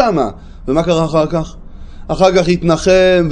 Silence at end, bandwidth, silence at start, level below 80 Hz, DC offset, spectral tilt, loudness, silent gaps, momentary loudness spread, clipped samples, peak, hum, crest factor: 0 s; 10.5 kHz; 0 s; -32 dBFS; under 0.1%; -6 dB/octave; -13 LUFS; none; 12 LU; under 0.1%; 0 dBFS; none; 14 dB